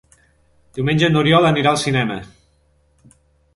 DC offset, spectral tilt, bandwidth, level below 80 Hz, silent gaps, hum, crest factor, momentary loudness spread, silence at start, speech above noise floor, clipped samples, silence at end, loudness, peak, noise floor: under 0.1%; -5.5 dB/octave; 11.5 kHz; -48 dBFS; none; none; 18 dB; 13 LU; 0.75 s; 43 dB; under 0.1%; 1.3 s; -16 LUFS; 0 dBFS; -59 dBFS